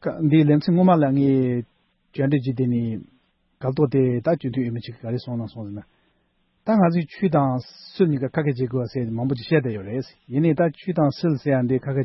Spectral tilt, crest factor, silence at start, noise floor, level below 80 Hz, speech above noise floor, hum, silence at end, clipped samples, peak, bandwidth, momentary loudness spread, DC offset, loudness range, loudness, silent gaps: -10.5 dB/octave; 16 dB; 0.05 s; -67 dBFS; -60 dBFS; 46 dB; none; 0 s; under 0.1%; -6 dBFS; 6 kHz; 13 LU; under 0.1%; 4 LU; -22 LUFS; none